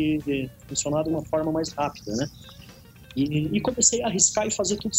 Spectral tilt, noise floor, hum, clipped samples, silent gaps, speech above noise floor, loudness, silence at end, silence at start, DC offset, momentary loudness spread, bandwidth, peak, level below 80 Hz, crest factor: -3.5 dB/octave; -47 dBFS; none; under 0.1%; none; 22 dB; -24 LUFS; 0 s; 0 s; under 0.1%; 10 LU; 16 kHz; -4 dBFS; -50 dBFS; 22 dB